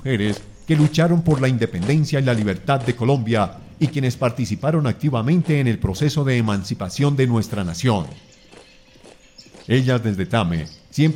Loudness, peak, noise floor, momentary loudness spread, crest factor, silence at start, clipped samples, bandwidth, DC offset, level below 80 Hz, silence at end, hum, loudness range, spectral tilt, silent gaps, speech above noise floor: -20 LUFS; -4 dBFS; -47 dBFS; 7 LU; 16 dB; 0 s; under 0.1%; 15 kHz; under 0.1%; -44 dBFS; 0 s; none; 4 LU; -7 dB/octave; none; 28 dB